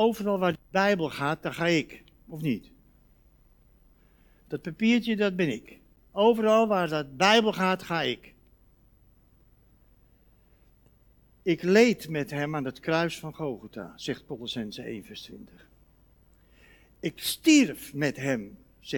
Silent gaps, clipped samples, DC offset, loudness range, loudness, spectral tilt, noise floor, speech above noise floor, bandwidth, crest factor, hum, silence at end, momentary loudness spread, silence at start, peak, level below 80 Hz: none; under 0.1%; under 0.1%; 13 LU; -27 LUFS; -5 dB/octave; -61 dBFS; 34 dB; 19 kHz; 22 dB; none; 0 s; 18 LU; 0 s; -6 dBFS; -62 dBFS